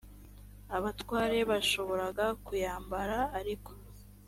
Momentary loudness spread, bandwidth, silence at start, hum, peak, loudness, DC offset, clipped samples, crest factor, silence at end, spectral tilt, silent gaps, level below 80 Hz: 18 LU; 16.5 kHz; 0.05 s; 50 Hz at -50 dBFS; -18 dBFS; -33 LUFS; under 0.1%; under 0.1%; 16 dB; 0 s; -4 dB/octave; none; -50 dBFS